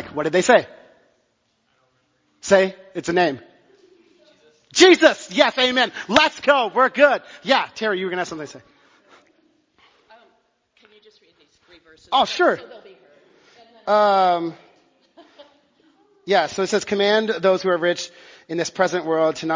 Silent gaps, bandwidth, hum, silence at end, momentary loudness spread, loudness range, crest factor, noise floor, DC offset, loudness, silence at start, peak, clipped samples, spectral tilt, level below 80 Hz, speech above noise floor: none; 7.6 kHz; none; 0 s; 14 LU; 9 LU; 22 dB; -68 dBFS; under 0.1%; -18 LUFS; 0 s; 0 dBFS; under 0.1%; -3.5 dB/octave; -62 dBFS; 49 dB